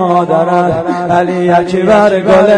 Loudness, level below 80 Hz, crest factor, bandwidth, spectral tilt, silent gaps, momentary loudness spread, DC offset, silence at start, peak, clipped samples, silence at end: -10 LUFS; -42 dBFS; 8 dB; 10 kHz; -7 dB/octave; none; 4 LU; under 0.1%; 0 s; 0 dBFS; under 0.1%; 0 s